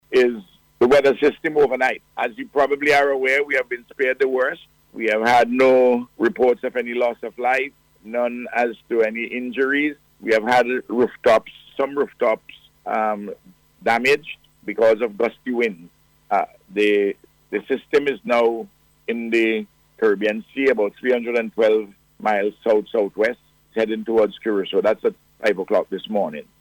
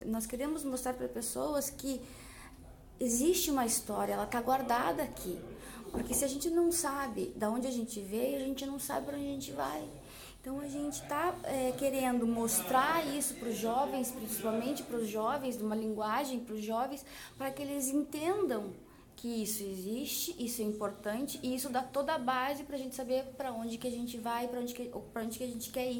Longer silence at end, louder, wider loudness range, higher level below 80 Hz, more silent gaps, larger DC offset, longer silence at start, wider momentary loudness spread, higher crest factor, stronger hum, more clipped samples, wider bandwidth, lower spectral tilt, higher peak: first, 0.2 s vs 0 s; first, -20 LUFS vs -35 LUFS; about the same, 4 LU vs 5 LU; about the same, -60 dBFS vs -60 dBFS; neither; neither; about the same, 0.1 s vs 0 s; about the same, 12 LU vs 11 LU; second, 14 dB vs 20 dB; neither; neither; about the same, 17.5 kHz vs 17 kHz; first, -5 dB/octave vs -3.5 dB/octave; first, -6 dBFS vs -16 dBFS